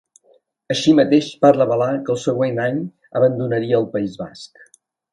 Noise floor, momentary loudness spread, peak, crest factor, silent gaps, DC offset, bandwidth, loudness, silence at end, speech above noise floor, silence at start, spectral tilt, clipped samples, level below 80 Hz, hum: -58 dBFS; 13 LU; 0 dBFS; 18 dB; none; under 0.1%; 10.5 kHz; -18 LUFS; 0.65 s; 40 dB; 0.7 s; -6 dB/octave; under 0.1%; -60 dBFS; none